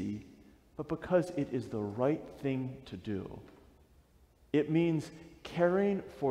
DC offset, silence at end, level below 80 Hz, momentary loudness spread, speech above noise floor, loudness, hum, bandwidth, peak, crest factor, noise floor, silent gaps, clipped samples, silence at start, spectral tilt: under 0.1%; 0 s; -62 dBFS; 16 LU; 31 dB; -34 LUFS; none; 12.5 kHz; -16 dBFS; 18 dB; -64 dBFS; none; under 0.1%; 0 s; -8 dB/octave